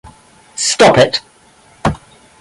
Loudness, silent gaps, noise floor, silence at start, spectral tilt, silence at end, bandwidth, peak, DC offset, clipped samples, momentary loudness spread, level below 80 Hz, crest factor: -12 LUFS; none; -47 dBFS; 0.05 s; -3.5 dB/octave; 0.45 s; 11.5 kHz; 0 dBFS; under 0.1%; under 0.1%; 18 LU; -40 dBFS; 16 dB